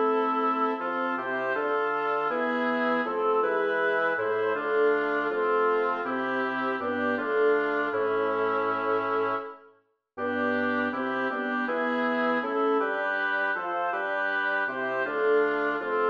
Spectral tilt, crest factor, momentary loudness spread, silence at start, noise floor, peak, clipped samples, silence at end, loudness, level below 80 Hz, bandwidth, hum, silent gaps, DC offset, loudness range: -6 dB/octave; 12 dB; 4 LU; 0 s; -63 dBFS; -14 dBFS; under 0.1%; 0 s; -27 LUFS; -76 dBFS; 6 kHz; none; none; under 0.1%; 3 LU